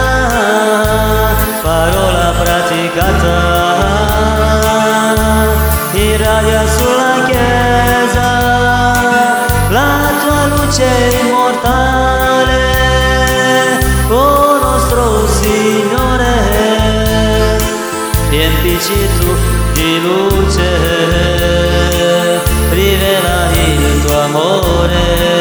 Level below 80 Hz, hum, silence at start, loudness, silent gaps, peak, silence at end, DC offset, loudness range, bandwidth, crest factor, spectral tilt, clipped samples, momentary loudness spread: -18 dBFS; none; 0 s; -11 LUFS; none; 0 dBFS; 0 s; under 0.1%; 2 LU; over 20 kHz; 10 dB; -4.5 dB/octave; under 0.1%; 2 LU